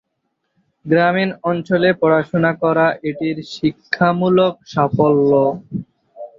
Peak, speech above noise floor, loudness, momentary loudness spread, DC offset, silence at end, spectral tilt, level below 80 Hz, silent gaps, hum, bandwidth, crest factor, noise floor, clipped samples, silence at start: -2 dBFS; 56 dB; -16 LUFS; 9 LU; under 0.1%; 0.1 s; -8 dB/octave; -56 dBFS; none; none; 7.4 kHz; 16 dB; -72 dBFS; under 0.1%; 0.85 s